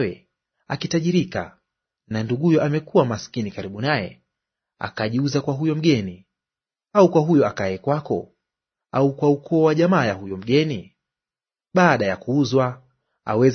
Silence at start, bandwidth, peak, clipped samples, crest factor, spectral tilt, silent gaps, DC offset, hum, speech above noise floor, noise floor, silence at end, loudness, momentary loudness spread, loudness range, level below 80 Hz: 0 s; 6.6 kHz; -2 dBFS; under 0.1%; 20 dB; -6.5 dB/octave; none; under 0.1%; none; over 70 dB; under -90 dBFS; 0 s; -21 LUFS; 12 LU; 4 LU; -60 dBFS